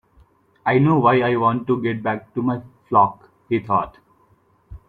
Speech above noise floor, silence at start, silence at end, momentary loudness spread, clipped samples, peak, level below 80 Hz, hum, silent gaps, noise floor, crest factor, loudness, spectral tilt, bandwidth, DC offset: 40 dB; 0.65 s; 0.1 s; 10 LU; under 0.1%; -2 dBFS; -52 dBFS; none; none; -59 dBFS; 18 dB; -20 LUFS; -10 dB/octave; 4.5 kHz; under 0.1%